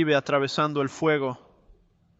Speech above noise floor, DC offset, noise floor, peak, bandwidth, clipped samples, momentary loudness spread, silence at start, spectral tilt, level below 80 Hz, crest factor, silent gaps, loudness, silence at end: 34 dB; under 0.1%; -58 dBFS; -8 dBFS; 8.2 kHz; under 0.1%; 8 LU; 0 s; -5.5 dB/octave; -64 dBFS; 18 dB; none; -25 LUFS; 0.85 s